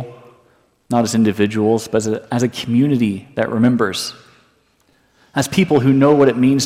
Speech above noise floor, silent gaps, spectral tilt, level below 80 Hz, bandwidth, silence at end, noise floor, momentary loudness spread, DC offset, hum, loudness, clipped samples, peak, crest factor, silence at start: 43 dB; none; -6 dB/octave; -56 dBFS; 15.5 kHz; 0 s; -58 dBFS; 9 LU; under 0.1%; none; -16 LUFS; under 0.1%; -2 dBFS; 14 dB; 0 s